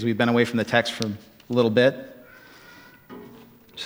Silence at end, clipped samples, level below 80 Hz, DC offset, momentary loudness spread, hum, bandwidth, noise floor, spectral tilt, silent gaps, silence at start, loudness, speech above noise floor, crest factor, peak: 0 s; under 0.1%; -66 dBFS; under 0.1%; 24 LU; none; 16.5 kHz; -49 dBFS; -5.5 dB/octave; none; 0 s; -22 LUFS; 27 dB; 22 dB; -2 dBFS